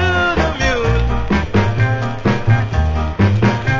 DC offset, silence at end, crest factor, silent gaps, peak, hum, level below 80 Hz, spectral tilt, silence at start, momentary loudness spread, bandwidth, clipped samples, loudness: under 0.1%; 0 s; 14 dB; none; 0 dBFS; none; -22 dBFS; -7 dB/octave; 0 s; 3 LU; 7.6 kHz; under 0.1%; -16 LUFS